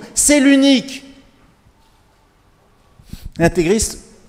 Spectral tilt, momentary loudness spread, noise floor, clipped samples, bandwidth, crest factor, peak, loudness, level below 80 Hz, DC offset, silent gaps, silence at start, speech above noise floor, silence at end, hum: -3.5 dB/octave; 21 LU; -54 dBFS; under 0.1%; 16 kHz; 18 dB; 0 dBFS; -14 LUFS; -38 dBFS; under 0.1%; none; 0 s; 40 dB; 0.3 s; none